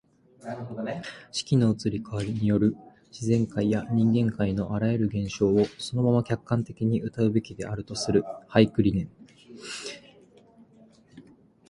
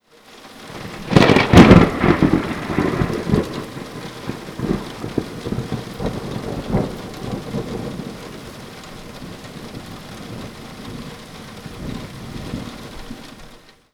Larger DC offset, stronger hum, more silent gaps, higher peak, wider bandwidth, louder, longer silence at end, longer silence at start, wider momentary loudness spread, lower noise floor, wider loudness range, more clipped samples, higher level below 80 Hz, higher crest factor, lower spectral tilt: neither; neither; neither; second, -4 dBFS vs 0 dBFS; second, 11 kHz vs 16.5 kHz; second, -26 LUFS vs -18 LUFS; about the same, 0.5 s vs 0.4 s; first, 0.45 s vs 0.3 s; second, 14 LU vs 23 LU; first, -56 dBFS vs -44 dBFS; second, 3 LU vs 19 LU; second, under 0.1% vs 0.2%; second, -52 dBFS vs -34 dBFS; about the same, 22 dB vs 20 dB; about the same, -7 dB/octave vs -6.5 dB/octave